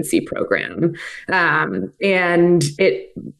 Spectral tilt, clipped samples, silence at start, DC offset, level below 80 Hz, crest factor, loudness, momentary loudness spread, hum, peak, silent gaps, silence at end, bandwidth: -5.5 dB/octave; under 0.1%; 0 s; under 0.1%; -58 dBFS; 14 dB; -18 LUFS; 8 LU; none; -4 dBFS; none; 0.1 s; 12.5 kHz